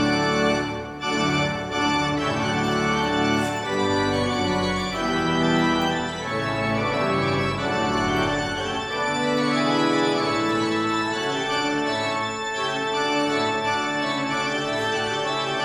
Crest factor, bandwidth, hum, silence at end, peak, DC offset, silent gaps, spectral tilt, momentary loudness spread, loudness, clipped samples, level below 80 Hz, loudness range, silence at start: 16 dB; 15.5 kHz; none; 0 s; -8 dBFS; under 0.1%; none; -4.5 dB/octave; 4 LU; -23 LUFS; under 0.1%; -48 dBFS; 1 LU; 0 s